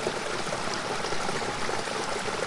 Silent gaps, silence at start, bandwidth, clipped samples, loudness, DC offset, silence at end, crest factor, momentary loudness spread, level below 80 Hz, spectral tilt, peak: none; 0 s; 11.5 kHz; under 0.1%; -30 LUFS; under 0.1%; 0 s; 16 dB; 1 LU; -52 dBFS; -3 dB/octave; -14 dBFS